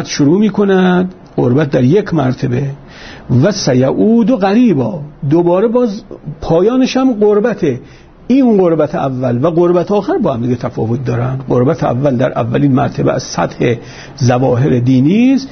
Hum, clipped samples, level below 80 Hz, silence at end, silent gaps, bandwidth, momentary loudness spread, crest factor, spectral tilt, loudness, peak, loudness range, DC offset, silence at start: none; under 0.1%; -42 dBFS; 0.05 s; none; 6.6 kHz; 8 LU; 10 dB; -7 dB/octave; -12 LUFS; -2 dBFS; 2 LU; under 0.1%; 0 s